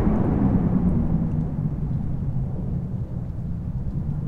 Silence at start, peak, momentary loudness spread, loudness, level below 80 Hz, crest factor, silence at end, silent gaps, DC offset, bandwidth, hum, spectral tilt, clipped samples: 0 s; -8 dBFS; 9 LU; -25 LUFS; -32 dBFS; 16 dB; 0 s; none; under 0.1%; 3.4 kHz; none; -12 dB/octave; under 0.1%